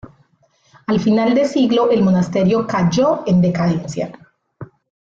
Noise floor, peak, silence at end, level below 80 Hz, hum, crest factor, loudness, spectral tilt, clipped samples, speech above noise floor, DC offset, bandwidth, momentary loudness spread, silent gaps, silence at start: -58 dBFS; -4 dBFS; 0.5 s; -52 dBFS; none; 12 dB; -16 LUFS; -7 dB/octave; under 0.1%; 43 dB; under 0.1%; 7.6 kHz; 10 LU; none; 0.9 s